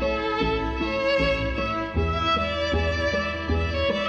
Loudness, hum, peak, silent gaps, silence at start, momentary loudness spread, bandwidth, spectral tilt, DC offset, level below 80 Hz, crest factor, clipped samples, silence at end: -24 LUFS; none; -12 dBFS; none; 0 s; 4 LU; 8.4 kHz; -6 dB/octave; under 0.1%; -34 dBFS; 12 dB; under 0.1%; 0 s